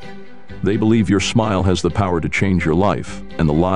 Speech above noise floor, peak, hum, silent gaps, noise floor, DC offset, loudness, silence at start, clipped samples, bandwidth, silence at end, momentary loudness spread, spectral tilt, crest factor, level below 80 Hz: 22 dB; -4 dBFS; none; none; -38 dBFS; 3%; -17 LUFS; 0 s; under 0.1%; 11 kHz; 0 s; 8 LU; -6 dB/octave; 14 dB; -36 dBFS